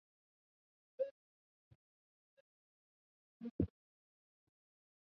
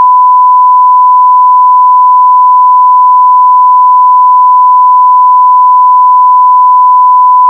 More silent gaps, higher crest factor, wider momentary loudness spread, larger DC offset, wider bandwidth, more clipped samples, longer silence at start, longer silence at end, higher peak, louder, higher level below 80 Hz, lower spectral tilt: first, 1.11-3.40 s, 3.51-3.59 s vs none; first, 28 dB vs 4 dB; first, 11 LU vs 0 LU; neither; first, 5.4 kHz vs 1.1 kHz; neither; first, 1 s vs 0 s; first, 1.4 s vs 0 s; second, -22 dBFS vs 0 dBFS; second, -45 LUFS vs -3 LUFS; first, -64 dBFS vs under -90 dBFS; first, -11 dB/octave vs -4.5 dB/octave